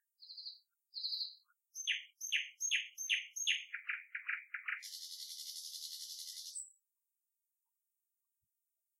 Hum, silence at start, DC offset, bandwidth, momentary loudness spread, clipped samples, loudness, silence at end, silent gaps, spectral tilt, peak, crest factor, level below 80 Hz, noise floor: none; 0.2 s; under 0.1%; 16 kHz; 13 LU; under 0.1%; -40 LUFS; 2.3 s; none; 10 dB/octave; -20 dBFS; 24 dB; under -90 dBFS; -89 dBFS